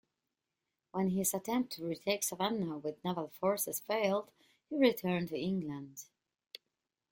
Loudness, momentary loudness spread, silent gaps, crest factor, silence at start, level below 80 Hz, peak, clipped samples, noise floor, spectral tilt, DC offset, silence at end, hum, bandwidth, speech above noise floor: -35 LUFS; 17 LU; none; 22 dB; 0.95 s; -76 dBFS; -14 dBFS; under 0.1%; -89 dBFS; -4.5 dB/octave; under 0.1%; 1.05 s; none; 16.5 kHz; 54 dB